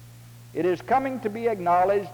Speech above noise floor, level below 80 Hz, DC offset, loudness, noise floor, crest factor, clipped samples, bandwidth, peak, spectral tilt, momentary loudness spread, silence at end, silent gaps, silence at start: 22 dB; -58 dBFS; under 0.1%; -24 LUFS; -46 dBFS; 14 dB; under 0.1%; over 20 kHz; -12 dBFS; -7 dB/octave; 7 LU; 0 s; none; 0 s